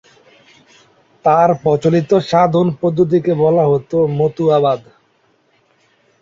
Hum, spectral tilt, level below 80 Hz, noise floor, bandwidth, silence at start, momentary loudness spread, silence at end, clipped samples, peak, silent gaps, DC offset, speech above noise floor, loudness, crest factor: none; -8 dB/octave; -56 dBFS; -58 dBFS; 7.6 kHz; 1.25 s; 4 LU; 1.4 s; under 0.1%; -2 dBFS; none; under 0.1%; 45 dB; -14 LUFS; 14 dB